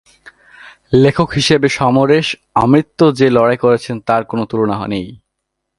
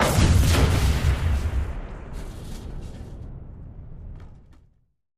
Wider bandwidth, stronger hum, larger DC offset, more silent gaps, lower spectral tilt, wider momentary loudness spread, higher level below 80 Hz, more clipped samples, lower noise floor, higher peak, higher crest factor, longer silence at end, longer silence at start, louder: second, 11.5 kHz vs 15.5 kHz; neither; neither; neither; about the same, -6 dB/octave vs -5.5 dB/octave; second, 7 LU vs 24 LU; second, -44 dBFS vs -28 dBFS; neither; first, -75 dBFS vs -60 dBFS; first, 0 dBFS vs -6 dBFS; about the same, 14 dB vs 18 dB; second, 0.65 s vs 0.85 s; first, 0.65 s vs 0 s; first, -13 LUFS vs -22 LUFS